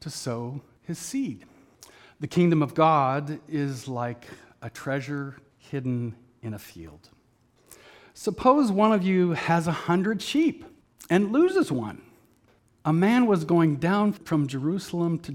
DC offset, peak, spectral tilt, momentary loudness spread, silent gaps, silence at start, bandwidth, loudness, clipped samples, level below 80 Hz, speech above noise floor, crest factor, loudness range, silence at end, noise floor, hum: under 0.1%; -6 dBFS; -6.5 dB/octave; 18 LU; none; 0.05 s; 16 kHz; -25 LUFS; under 0.1%; -62 dBFS; 39 dB; 20 dB; 11 LU; 0 s; -63 dBFS; none